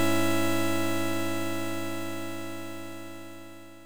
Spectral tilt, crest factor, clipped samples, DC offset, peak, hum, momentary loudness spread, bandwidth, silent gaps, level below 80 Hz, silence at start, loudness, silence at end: -4.5 dB/octave; 18 dB; under 0.1%; 2%; -12 dBFS; none; 17 LU; over 20 kHz; none; -70 dBFS; 0 s; -31 LUFS; 0 s